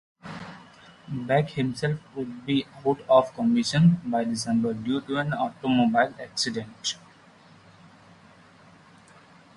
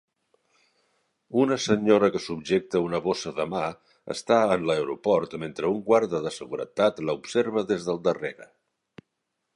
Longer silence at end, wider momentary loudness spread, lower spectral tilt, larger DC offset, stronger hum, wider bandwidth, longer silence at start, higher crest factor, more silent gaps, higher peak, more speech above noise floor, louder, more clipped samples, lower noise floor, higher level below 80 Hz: first, 2.6 s vs 1.1 s; first, 17 LU vs 11 LU; about the same, -5.5 dB/octave vs -5.5 dB/octave; neither; neither; about the same, 11.5 kHz vs 11.5 kHz; second, 0.25 s vs 1.3 s; about the same, 20 dB vs 20 dB; neither; about the same, -6 dBFS vs -6 dBFS; second, 29 dB vs 55 dB; about the same, -25 LUFS vs -25 LUFS; neither; second, -53 dBFS vs -80 dBFS; about the same, -62 dBFS vs -62 dBFS